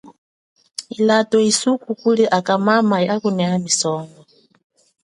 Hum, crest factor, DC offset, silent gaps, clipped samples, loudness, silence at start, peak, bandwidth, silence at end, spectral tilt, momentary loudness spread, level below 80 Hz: none; 18 dB; under 0.1%; 0.18-0.56 s; under 0.1%; -17 LUFS; 0.05 s; -2 dBFS; 11.5 kHz; 0.95 s; -4 dB/octave; 14 LU; -66 dBFS